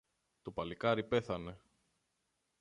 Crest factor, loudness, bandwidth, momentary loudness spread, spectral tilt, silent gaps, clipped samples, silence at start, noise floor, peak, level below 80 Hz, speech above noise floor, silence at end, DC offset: 20 dB; -37 LUFS; 10.5 kHz; 15 LU; -6.5 dB/octave; none; under 0.1%; 0.45 s; -83 dBFS; -20 dBFS; -64 dBFS; 46 dB; 1.05 s; under 0.1%